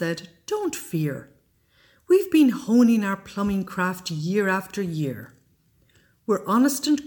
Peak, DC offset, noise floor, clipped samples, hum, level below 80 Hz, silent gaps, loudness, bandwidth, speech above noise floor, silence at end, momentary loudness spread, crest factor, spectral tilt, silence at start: -8 dBFS; under 0.1%; -62 dBFS; under 0.1%; none; -58 dBFS; none; -23 LUFS; 19 kHz; 40 dB; 0 s; 12 LU; 16 dB; -5.5 dB/octave; 0 s